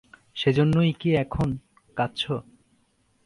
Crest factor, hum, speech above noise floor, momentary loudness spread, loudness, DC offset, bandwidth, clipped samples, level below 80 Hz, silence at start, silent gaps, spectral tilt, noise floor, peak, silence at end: 18 dB; none; 43 dB; 15 LU; -25 LUFS; under 0.1%; 11 kHz; under 0.1%; -48 dBFS; 0.35 s; none; -7.5 dB/octave; -66 dBFS; -8 dBFS; 0.85 s